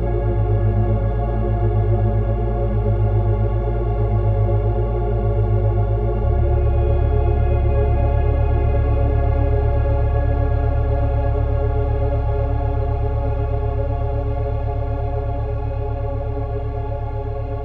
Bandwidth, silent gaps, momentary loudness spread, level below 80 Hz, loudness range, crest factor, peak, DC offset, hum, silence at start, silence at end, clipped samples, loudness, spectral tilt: 3.7 kHz; none; 6 LU; -20 dBFS; 4 LU; 12 dB; -6 dBFS; under 0.1%; none; 0 s; 0 s; under 0.1%; -20 LUFS; -11.5 dB/octave